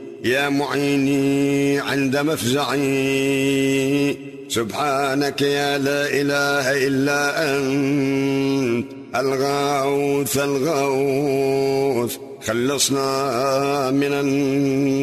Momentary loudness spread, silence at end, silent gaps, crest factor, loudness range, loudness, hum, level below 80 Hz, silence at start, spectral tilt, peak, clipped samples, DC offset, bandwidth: 3 LU; 0 s; none; 14 dB; 1 LU; -20 LUFS; none; -58 dBFS; 0 s; -4.5 dB/octave; -6 dBFS; under 0.1%; under 0.1%; 13.5 kHz